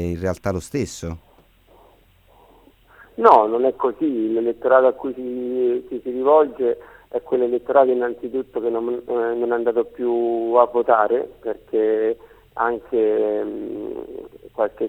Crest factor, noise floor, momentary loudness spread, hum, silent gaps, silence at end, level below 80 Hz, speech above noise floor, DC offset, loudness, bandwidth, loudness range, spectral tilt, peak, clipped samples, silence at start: 20 dB; -54 dBFS; 14 LU; none; none; 0 s; -52 dBFS; 34 dB; under 0.1%; -20 LUFS; 12.5 kHz; 4 LU; -7 dB/octave; 0 dBFS; under 0.1%; 0 s